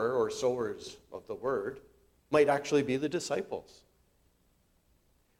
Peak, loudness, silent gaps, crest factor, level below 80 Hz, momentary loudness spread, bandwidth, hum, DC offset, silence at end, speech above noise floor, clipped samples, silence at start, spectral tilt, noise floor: -12 dBFS; -31 LUFS; none; 20 dB; -68 dBFS; 17 LU; 15 kHz; none; under 0.1%; 1.8 s; 39 dB; under 0.1%; 0 s; -5 dB/octave; -70 dBFS